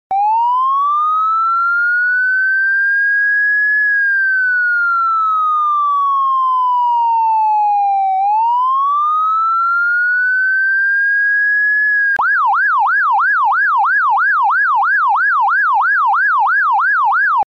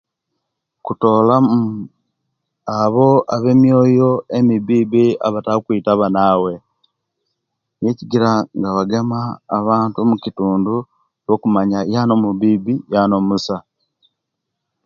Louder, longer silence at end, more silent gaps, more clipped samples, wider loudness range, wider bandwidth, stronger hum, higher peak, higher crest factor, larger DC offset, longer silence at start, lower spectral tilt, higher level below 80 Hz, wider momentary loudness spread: first, -13 LUFS vs -16 LUFS; second, 0.05 s vs 1.25 s; neither; neither; about the same, 2 LU vs 4 LU; about the same, 7.2 kHz vs 7.2 kHz; neither; second, -8 dBFS vs 0 dBFS; second, 6 dB vs 16 dB; neither; second, 0.1 s vs 0.85 s; second, 0 dB/octave vs -8 dB/octave; second, -72 dBFS vs -54 dBFS; second, 2 LU vs 11 LU